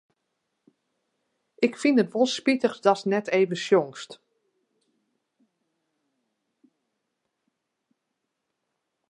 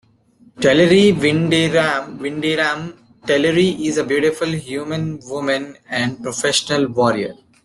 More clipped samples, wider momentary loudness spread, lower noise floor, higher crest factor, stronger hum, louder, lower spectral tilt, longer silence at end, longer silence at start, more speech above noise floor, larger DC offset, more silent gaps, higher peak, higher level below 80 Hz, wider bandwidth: neither; second, 8 LU vs 12 LU; first, -81 dBFS vs -52 dBFS; first, 24 dB vs 16 dB; neither; second, -24 LUFS vs -17 LUFS; about the same, -5 dB/octave vs -4.5 dB/octave; first, 4.95 s vs 0.3 s; first, 1.6 s vs 0.6 s; first, 58 dB vs 35 dB; neither; neither; second, -6 dBFS vs 0 dBFS; second, -82 dBFS vs -52 dBFS; second, 11 kHz vs 12.5 kHz